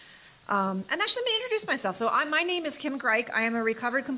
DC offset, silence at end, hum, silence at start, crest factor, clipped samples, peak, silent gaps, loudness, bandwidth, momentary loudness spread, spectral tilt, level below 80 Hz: under 0.1%; 0 s; none; 0 s; 16 dB; under 0.1%; -12 dBFS; none; -27 LUFS; 4 kHz; 5 LU; -1.5 dB/octave; -72 dBFS